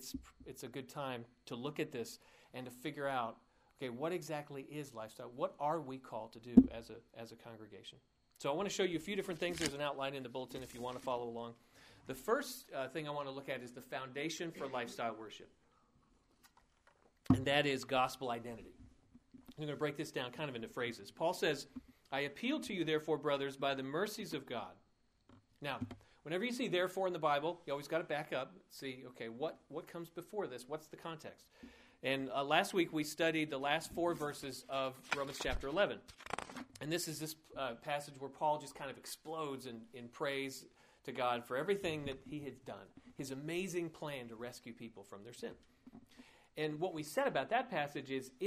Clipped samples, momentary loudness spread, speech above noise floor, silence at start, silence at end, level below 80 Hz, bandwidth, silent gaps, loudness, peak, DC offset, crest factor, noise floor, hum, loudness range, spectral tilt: under 0.1%; 16 LU; 32 dB; 0 s; 0 s; -64 dBFS; 15.5 kHz; none; -40 LUFS; -10 dBFS; under 0.1%; 32 dB; -72 dBFS; none; 8 LU; -4.5 dB/octave